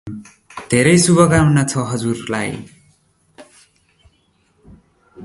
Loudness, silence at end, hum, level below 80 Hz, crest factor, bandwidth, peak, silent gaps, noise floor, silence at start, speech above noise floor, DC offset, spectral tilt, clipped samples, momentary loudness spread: -15 LUFS; 0 s; none; -44 dBFS; 18 dB; 11.5 kHz; 0 dBFS; none; -60 dBFS; 0.05 s; 45 dB; under 0.1%; -5 dB/octave; under 0.1%; 23 LU